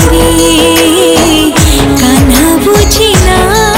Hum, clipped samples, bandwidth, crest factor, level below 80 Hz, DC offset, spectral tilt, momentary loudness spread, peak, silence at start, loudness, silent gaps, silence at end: none; 0.2%; 19.5 kHz; 6 dB; -14 dBFS; 0.5%; -4 dB/octave; 1 LU; 0 dBFS; 0 s; -6 LUFS; none; 0 s